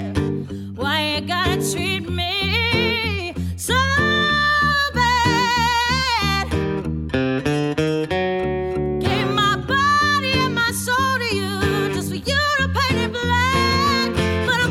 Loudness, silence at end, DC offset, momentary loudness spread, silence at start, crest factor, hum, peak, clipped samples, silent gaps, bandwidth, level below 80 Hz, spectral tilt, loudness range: -19 LUFS; 0 s; under 0.1%; 7 LU; 0 s; 14 dB; none; -6 dBFS; under 0.1%; none; 17 kHz; -36 dBFS; -4.5 dB/octave; 3 LU